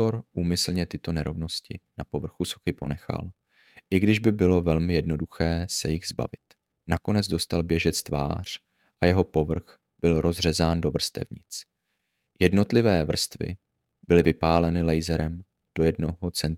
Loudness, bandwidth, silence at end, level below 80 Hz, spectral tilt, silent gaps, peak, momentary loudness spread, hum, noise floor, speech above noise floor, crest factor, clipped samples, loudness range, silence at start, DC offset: -26 LUFS; 16.5 kHz; 0 s; -42 dBFS; -5.5 dB/octave; none; -4 dBFS; 13 LU; none; -78 dBFS; 53 dB; 22 dB; under 0.1%; 4 LU; 0 s; under 0.1%